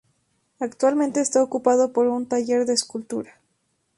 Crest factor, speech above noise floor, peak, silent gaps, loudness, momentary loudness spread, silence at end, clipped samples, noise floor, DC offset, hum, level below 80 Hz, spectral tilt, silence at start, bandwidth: 18 dB; 50 dB; -4 dBFS; none; -22 LUFS; 12 LU; 0.75 s; under 0.1%; -71 dBFS; under 0.1%; none; -70 dBFS; -3 dB/octave; 0.6 s; 11.5 kHz